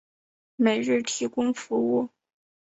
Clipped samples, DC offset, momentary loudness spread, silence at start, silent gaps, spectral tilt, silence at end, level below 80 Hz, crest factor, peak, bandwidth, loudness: under 0.1%; under 0.1%; 5 LU; 0.6 s; none; -4 dB/octave; 0.75 s; -70 dBFS; 18 dB; -8 dBFS; 8.2 kHz; -26 LUFS